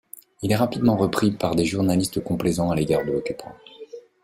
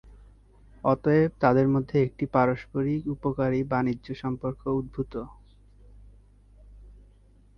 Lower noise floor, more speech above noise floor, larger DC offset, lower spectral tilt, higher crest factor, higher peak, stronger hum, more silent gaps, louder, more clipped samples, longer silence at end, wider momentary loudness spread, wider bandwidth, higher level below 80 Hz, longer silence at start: second, -42 dBFS vs -56 dBFS; second, 20 dB vs 31 dB; neither; second, -6 dB/octave vs -10 dB/octave; about the same, 18 dB vs 20 dB; about the same, -6 dBFS vs -8 dBFS; second, none vs 50 Hz at -50 dBFS; neither; first, -23 LUFS vs -26 LUFS; neither; second, 0.25 s vs 0.65 s; first, 21 LU vs 11 LU; first, 16 kHz vs 6.2 kHz; about the same, -50 dBFS vs -50 dBFS; first, 0.4 s vs 0.05 s